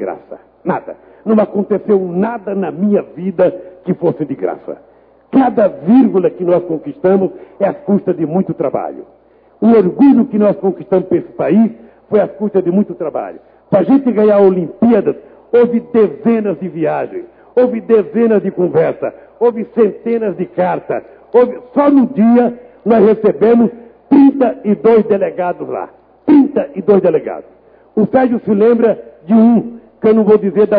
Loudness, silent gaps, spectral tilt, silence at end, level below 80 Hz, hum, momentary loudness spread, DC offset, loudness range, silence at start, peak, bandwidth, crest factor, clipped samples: -13 LUFS; none; -12 dB/octave; 0 s; -56 dBFS; none; 12 LU; under 0.1%; 4 LU; 0 s; 0 dBFS; 4.7 kHz; 12 dB; under 0.1%